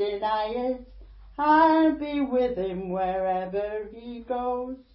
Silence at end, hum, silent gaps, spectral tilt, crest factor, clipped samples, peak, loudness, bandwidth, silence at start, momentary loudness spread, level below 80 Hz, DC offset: 0.15 s; none; none; -10 dB/octave; 18 dB; under 0.1%; -8 dBFS; -25 LUFS; 5.8 kHz; 0 s; 15 LU; -52 dBFS; under 0.1%